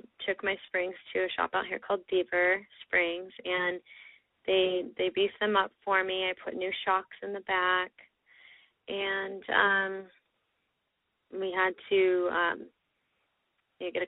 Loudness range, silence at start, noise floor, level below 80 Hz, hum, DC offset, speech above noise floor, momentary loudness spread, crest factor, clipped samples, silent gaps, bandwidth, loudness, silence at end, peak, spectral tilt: 3 LU; 0.2 s; -80 dBFS; -70 dBFS; none; under 0.1%; 50 dB; 12 LU; 22 dB; under 0.1%; none; 4 kHz; -30 LUFS; 0 s; -8 dBFS; -0.5 dB/octave